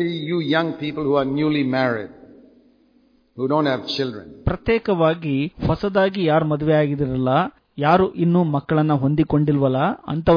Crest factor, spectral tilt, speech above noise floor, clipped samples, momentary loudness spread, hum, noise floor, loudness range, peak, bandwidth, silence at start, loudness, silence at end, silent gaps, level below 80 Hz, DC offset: 16 dB; -8.5 dB/octave; 39 dB; under 0.1%; 7 LU; none; -58 dBFS; 5 LU; -4 dBFS; 5.2 kHz; 0 s; -20 LUFS; 0 s; none; -44 dBFS; under 0.1%